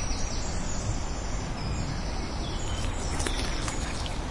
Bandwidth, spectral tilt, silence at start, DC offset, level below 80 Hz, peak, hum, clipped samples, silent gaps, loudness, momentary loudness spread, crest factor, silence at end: 11.5 kHz; -4 dB/octave; 0 s; under 0.1%; -32 dBFS; -10 dBFS; none; under 0.1%; none; -32 LUFS; 4 LU; 20 dB; 0 s